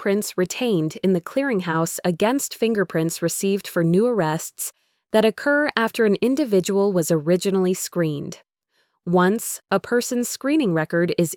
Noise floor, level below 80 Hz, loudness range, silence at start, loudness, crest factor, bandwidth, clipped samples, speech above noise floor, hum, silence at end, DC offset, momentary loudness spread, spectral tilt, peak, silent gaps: -69 dBFS; -64 dBFS; 2 LU; 0 s; -21 LUFS; 18 dB; 19.5 kHz; under 0.1%; 48 dB; none; 0 s; under 0.1%; 5 LU; -5 dB/octave; -4 dBFS; none